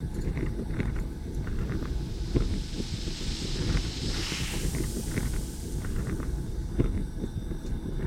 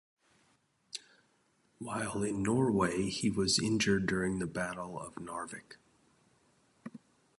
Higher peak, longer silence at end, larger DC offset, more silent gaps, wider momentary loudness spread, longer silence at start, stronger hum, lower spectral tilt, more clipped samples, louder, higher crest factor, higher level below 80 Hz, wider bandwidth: first, -10 dBFS vs -16 dBFS; second, 0 s vs 0.4 s; neither; neither; second, 5 LU vs 19 LU; second, 0 s vs 0.95 s; neither; about the same, -5 dB/octave vs -4.5 dB/octave; neither; about the same, -33 LUFS vs -33 LUFS; about the same, 20 dB vs 20 dB; first, -32 dBFS vs -60 dBFS; first, 16.5 kHz vs 11.5 kHz